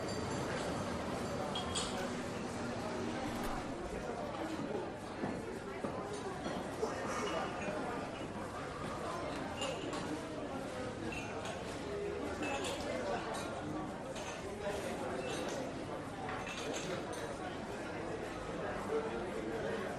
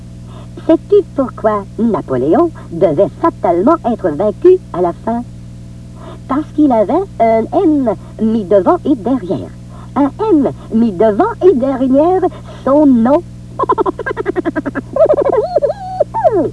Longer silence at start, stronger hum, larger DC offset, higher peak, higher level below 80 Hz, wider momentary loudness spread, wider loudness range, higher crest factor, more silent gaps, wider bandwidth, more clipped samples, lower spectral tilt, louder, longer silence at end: about the same, 0 s vs 0 s; second, none vs 60 Hz at -30 dBFS; second, under 0.1% vs 0.2%; second, -26 dBFS vs 0 dBFS; second, -58 dBFS vs -38 dBFS; second, 4 LU vs 11 LU; about the same, 2 LU vs 3 LU; about the same, 16 dB vs 12 dB; neither; first, 13.5 kHz vs 11 kHz; second, under 0.1% vs 0.1%; second, -4.5 dB/octave vs -8.5 dB/octave; second, -40 LUFS vs -13 LUFS; about the same, 0 s vs 0 s